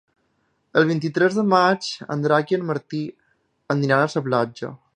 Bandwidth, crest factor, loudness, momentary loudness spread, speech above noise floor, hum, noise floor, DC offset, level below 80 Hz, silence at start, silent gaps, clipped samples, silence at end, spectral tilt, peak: 10 kHz; 20 dB; -21 LUFS; 11 LU; 48 dB; none; -68 dBFS; under 0.1%; -70 dBFS; 0.75 s; none; under 0.1%; 0.2 s; -6 dB/octave; -2 dBFS